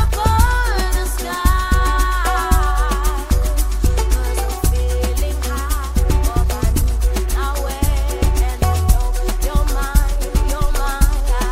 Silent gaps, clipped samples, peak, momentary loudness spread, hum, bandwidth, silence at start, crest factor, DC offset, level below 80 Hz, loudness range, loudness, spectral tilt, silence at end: none; under 0.1%; 0 dBFS; 5 LU; none; 16 kHz; 0 s; 16 dB; under 0.1%; -16 dBFS; 2 LU; -19 LUFS; -5 dB/octave; 0 s